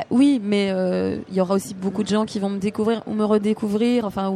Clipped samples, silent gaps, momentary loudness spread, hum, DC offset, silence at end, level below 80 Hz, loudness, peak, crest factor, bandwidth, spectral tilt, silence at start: under 0.1%; none; 6 LU; none; under 0.1%; 0 s; -58 dBFS; -22 LUFS; -8 dBFS; 14 dB; 14 kHz; -6.5 dB/octave; 0 s